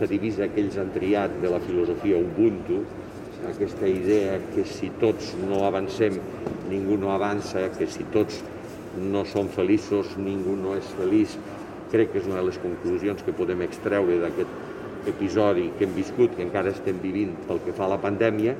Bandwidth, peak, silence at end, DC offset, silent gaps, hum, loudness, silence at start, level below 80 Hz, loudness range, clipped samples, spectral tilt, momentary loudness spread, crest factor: 13.5 kHz; -8 dBFS; 0 s; under 0.1%; none; none; -26 LUFS; 0 s; -54 dBFS; 2 LU; under 0.1%; -7 dB/octave; 9 LU; 16 dB